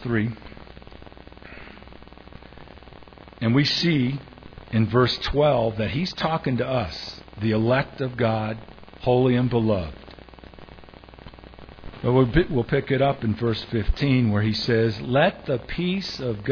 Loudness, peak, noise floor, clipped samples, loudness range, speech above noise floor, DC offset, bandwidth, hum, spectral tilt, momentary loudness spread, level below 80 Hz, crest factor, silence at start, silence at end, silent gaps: -23 LUFS; -4 dBFS; -45 dBFS; under 0.1%; 4 LU; 23 dB; under 0.1%; 5.4 kHz; none; -7.5 dB/octave; 23 LU; -40 dBFS; 20 dB; 0 s; 0 s; none